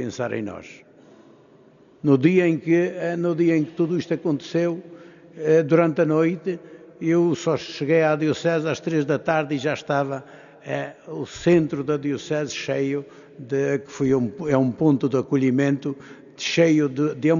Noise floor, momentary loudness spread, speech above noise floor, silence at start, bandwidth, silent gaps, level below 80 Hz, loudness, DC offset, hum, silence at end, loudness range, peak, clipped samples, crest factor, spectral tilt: -52 dBFS; 12 LU; 31 dB; 0 s; 7.4 kHz; none; -62 dBFS; -22 LUFS; under 0.1%; none; 0 s; 3 LU; -4 dBFS; under 0.1%; 18 dB; -6 dB/octave